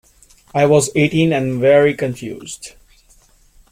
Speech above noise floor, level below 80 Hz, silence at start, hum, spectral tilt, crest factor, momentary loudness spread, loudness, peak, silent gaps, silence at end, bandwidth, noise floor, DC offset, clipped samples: 36 dB; -50 dBFS; 0.55 s; none; -5.5 dB/octave; 16 dB; 18 LU; -15 LUFS; -2 dBFS; none; 1.05 s; 16 kHz; -51 dBFS; under 0.1%; under 0.1%